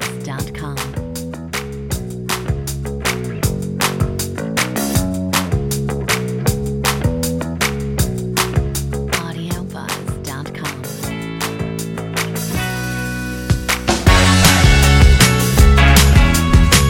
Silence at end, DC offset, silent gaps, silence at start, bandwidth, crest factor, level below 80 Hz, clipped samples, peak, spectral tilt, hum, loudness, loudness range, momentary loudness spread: 0 s; under 0.1%; none; 0 s; 17 kHz; 16 dB; -20 dBFS; under 0.1%; 0 dBFS; -4.5 dB/octave; none; -17 LUFS; 11 LU; 15 LU